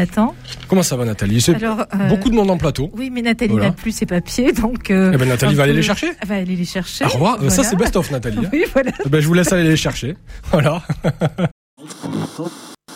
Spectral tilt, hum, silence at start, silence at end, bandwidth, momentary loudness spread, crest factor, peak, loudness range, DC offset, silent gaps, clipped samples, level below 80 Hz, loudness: -5.5 dB/octave; none; 0 s; 0 s; 16 kHz; 11 LU; 14 dB; -4 dBFS; 2 LU; under 0.1%; 11.51-11.77 s; under 0.1%; -34 dBFS; -17 LUFS